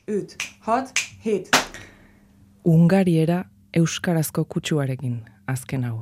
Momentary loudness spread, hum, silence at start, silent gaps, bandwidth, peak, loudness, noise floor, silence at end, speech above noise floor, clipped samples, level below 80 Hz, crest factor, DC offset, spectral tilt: 13 LU; none; 0.1 s; none; 15.5 kHz; -2 dBFS; -22 LUFS; -53 dBFS; 0 s; 32 dB; under 0.1%; -58 dBFS; 22 dB; under 0.1%; -5.5 dB/octave